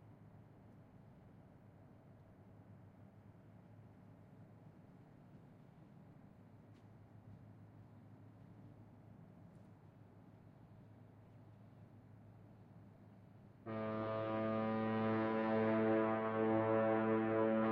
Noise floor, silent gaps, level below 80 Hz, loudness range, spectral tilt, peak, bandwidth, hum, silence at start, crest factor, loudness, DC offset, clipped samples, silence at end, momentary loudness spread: -62 dBFS; none; -76 dBFS; 25 LU; -6.5 dB/octave; -24 dBFS; 5 kHz; none; 0.05 s; 20 dB; -37 LUFS; under 0.1%; under 0.1%; 0 s; 27 LU